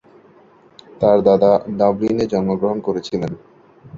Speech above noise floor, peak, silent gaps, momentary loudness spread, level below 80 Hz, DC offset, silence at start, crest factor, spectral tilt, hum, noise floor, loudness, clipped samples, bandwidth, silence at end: 33 dB; -2 dBFS; none; 11 LU; -52 dBFS; under 0.1%; 1 s; 18 dB; -8 dB/octave; none; -49 dBFS; -17 LUFS; under 0.1%; 7.4 kHz; 0 s